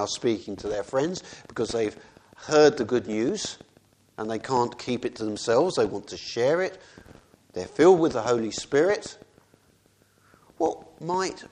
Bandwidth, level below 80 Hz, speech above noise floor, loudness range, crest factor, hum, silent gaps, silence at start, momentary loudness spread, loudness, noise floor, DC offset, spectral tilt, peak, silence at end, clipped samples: 10.5 kHz; -60 dBFS; 37 dB; 3 LU; 22 dB; none; none; 0 s; 16 LU; -25 LUFS; -62 dBFS; under 0.1%; -4.5 dB/octave; -6 dBFS; 0.05 s; under 0.1%